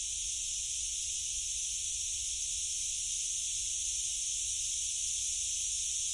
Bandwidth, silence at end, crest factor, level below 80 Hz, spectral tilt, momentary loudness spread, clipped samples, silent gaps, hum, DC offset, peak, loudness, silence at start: 11.5 kHz; 0 s; 12 dB; -56 dBFS; 3 dB/octave; 2 LU; under 0.1%; none; none; under 0.1%; -22 dBFS; -32 LUFS; 0 s